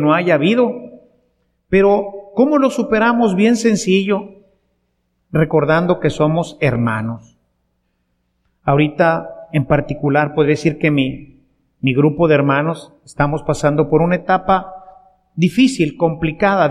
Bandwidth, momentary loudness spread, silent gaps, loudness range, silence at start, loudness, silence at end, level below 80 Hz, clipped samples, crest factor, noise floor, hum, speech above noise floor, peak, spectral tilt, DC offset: 12 kHz; 9 LU; none; 4 LU; 0 s; -16 LUFS; 0 s; -44 dBFS; under 0.1%; 16 dB; -67 dBFS; none; 52 dB; -2 dBFS; -6.5 dB/octave; under 0.1%